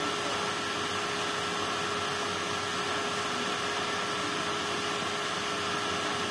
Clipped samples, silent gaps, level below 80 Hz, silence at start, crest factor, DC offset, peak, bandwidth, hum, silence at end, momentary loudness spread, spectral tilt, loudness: under 0.1%; none; -66 dBFS; 0 s; 14 dB; under 0.1%; -18 dBFS; 11 kHz; none; 0 s; 1 LU; -2 dB/octave; -30 LUFS